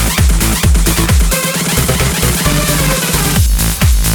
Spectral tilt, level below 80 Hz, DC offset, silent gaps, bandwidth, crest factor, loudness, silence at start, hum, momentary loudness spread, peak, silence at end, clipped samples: -3.5 dB/octave; -14 dBFS; under 0.1%; none; over 20 kHz; 10 dB; -12 LUFS; 0 s; none; 1 LU; 0 dBFS; 0 s; under 0.1%